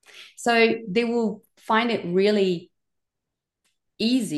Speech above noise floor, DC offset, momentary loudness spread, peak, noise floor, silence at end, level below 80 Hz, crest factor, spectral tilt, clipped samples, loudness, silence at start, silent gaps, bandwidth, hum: 63 dB; under 0.1%; 9 LU; -8 dBFS; -85 dBFS; 0 s; -72 dBFS; 18 dB; -5 dB/octave; under 0.1%; -23 LUFS; 0.15 s; none; 12.5 kHz; none